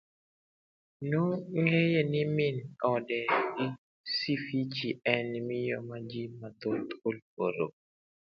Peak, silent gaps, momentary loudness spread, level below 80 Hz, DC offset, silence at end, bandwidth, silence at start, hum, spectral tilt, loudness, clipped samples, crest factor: -8 dBFS; 3.78-4.04 s, 7.22-7.37 s; 11 LU; -74 dBFS; under 0.1%; 0.65 s; 6.6 kHz; 1 s; none; -8 dB/octave; -32 LUFS; under 0.1%; 24 dB